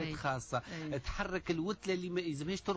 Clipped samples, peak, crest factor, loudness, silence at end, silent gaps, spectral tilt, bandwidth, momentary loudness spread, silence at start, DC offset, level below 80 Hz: under 0.1%; -22 dBFS; 14 dB; -38 LUFS; 0 s; none; -5.5 dB/octave; 8 kHz; 4 LU; 0 s; under 0.1%; -52 dBFS